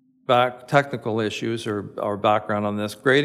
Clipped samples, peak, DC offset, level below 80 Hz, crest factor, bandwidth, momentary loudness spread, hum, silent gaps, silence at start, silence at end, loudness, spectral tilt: under 0.1%; -2 dBFS; under 0.1%; -68 dBFS; 20 dB; 15.5 kHz; 7 LU; none; none; 0.3 s; 0 s; -23 LUFS; -5.5 dB/octave